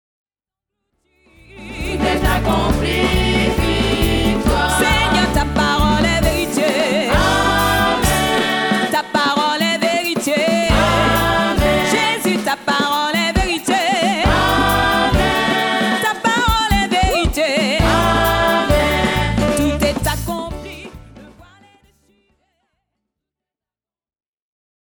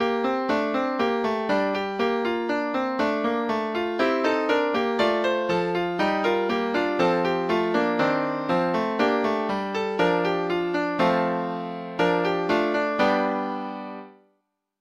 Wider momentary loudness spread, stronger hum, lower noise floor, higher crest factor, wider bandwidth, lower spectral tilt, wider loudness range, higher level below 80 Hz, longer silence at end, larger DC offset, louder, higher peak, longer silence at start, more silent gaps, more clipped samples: about the same, 4 LU vs 5 LU; neither; first, under -90 dBFS vs -73 dBFS; about the same, 16 dB vs 16 dB; first, over 20 kHz vs 13 kHz; second, -4.5 dB/octave vs -6 dB/octave; about the same, 4 LU vs 2 LU; first, -26 dBFS vs -60 dBFS; first, 3.7 s vs 0.7 s; neither; first, -16 LUFS vs -24 LUFS; first, -2 dBFS vs -8 dBFS; first, 1.55 s vs 0 s; neither; neither